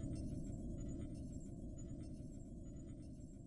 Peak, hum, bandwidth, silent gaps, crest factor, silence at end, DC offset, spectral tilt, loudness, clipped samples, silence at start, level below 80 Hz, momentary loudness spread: -34 dBFS; none; 11.5 kHz; none; 14 dB; 0 s; under 0.1%; -8 dB/octave; -51 LUFS; under 0.1%; 0 s; -54 dBFS; 6 LU